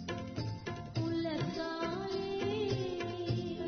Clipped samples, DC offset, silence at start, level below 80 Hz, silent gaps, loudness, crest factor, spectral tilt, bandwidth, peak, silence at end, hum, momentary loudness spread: under 0.1%; under 0.1%; 0 s; -58 dBFS; none; -37 LUFS; 14 dB; -5.5 dB/octave; 6.6 kHz; -22 dBFS; 0 s; none; 5 LU